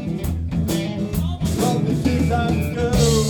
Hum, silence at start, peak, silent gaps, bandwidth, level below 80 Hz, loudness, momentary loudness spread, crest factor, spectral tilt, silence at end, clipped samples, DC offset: none; 0 s; -6 dBFS; none; over 20 kHz; -30 dBFS; -21 LUFS; 5 LU; 14 dB; -6 dB/octave; 0 s; under 0.1%; under 0.1%